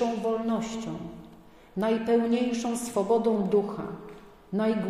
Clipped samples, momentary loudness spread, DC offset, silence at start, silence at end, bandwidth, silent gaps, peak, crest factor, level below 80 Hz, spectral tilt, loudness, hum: under 0.1%; 14 LU; under 0.1%; 0 s; 0 s; 15 kHz; none; -12 dBFS; 16 dB; -60 dBFS; -6 dB/octave; -28 LUFS; none